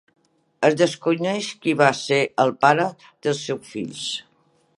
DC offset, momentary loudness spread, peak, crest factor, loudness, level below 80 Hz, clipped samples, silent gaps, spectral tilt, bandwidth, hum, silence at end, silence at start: under 0.1%; 11 LU; 0 dBFS; 22 dB; -21 LUFS; -70 dBFS; under 0.1%; none; -4.5 dB/octave; 11.5 kHz; none; 0.55 s; 0.6 s